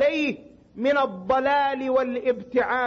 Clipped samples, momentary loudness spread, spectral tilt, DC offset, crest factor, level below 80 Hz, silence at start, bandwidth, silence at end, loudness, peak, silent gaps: under 0.1%; 6 LU; -5.5 dB/octave; under 0.1%; 14 dB; -58 dBFS; 0 s; 7 kHz; 0 s; -24 LUFS; -10 dBFS; none